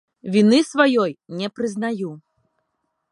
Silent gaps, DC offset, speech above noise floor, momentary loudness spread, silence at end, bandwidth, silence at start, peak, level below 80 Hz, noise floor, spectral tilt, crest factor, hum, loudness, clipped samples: none; under 0.1%; 55 dB; 13 LU; 0.95 s; 11 kHz; 0.25 s; -2 dBFS; -70 dBFS; -74 dBFS; -5.5 dB/octave; 20 dB; none; -20 LUFS; under 0.1%